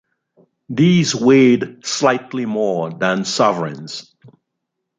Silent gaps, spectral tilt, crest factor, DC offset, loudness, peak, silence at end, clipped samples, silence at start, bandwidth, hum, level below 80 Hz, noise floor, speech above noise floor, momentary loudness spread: none; -5 dB/octave; 16 dB; under 0.1%; -16 LUFS; -2 dBFS; 1 s; under 0.1%; 0.7 s; 9.4 kHz; none; -62 dBFS; -77 dBFS; 61 dB; 14 LU